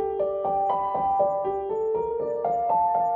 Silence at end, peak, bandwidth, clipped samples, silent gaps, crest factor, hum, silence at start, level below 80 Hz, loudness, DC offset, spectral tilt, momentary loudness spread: 0 s; -12 dBFS; 3.6 kHz; under 0.1%; none; 14 dB; none; 0 s; -56 dBFS; -25 LUFS; under 0.1%; -8.5 dB/octave; 5 LU